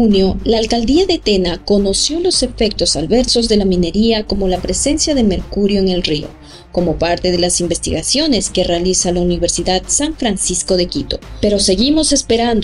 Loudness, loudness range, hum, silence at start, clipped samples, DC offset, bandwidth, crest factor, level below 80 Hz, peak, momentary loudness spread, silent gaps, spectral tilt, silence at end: -14 LUFS; 2 LU; none; 0 s; under 0.1%; under 0.1%; 11.5 kHz; 12 dB; -28 dBFS; -2 dBFS; 5 LU; none; -4 dB/octave; 0 s